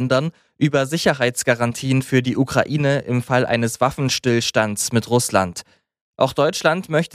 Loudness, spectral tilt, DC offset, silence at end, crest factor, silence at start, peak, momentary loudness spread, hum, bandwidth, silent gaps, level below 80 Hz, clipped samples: -19 LUFS; -4.5 dB/octave; under 0.1%; 0.05 s; 18 dB; 0 s; -2 dBFS; 3 LU; none; 15.5 kHz; 6.01-6.13 s; -54 dBFS; under 0.1%